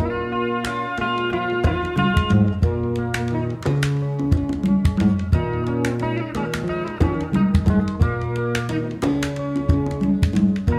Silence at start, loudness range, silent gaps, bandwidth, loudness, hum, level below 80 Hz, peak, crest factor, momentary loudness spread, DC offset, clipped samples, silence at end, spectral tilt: 0 s; 1 LU; none; 13.5 kHz; -21 LUFS; none; -30 dBFS; -4 dBFS; 16 dB; 6 LU; under 0.1%; under 0.1%; 0 s; -7 dB/octave